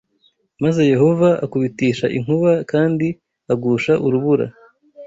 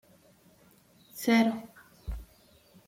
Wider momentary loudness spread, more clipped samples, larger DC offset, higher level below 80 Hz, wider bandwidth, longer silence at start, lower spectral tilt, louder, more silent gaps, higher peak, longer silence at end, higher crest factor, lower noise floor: second, 8 LU vs 23 LU; neither; neither; second, -54 dBFS vs -48 dBFS; second, 8 kHz vs 16.5 kHz; second, 0.6 s vs 1.15 s; first, -8 dB/octave vs -5 dB/octave; first, -17 LUFS vs -28 LUFS; neither; first, -2 dBFS vs -14 dBFS; second, 0 s vs 0.65 s; about the same, 16 dB vs 20 dB; about the same, -61 dBFS vs -61 dBFS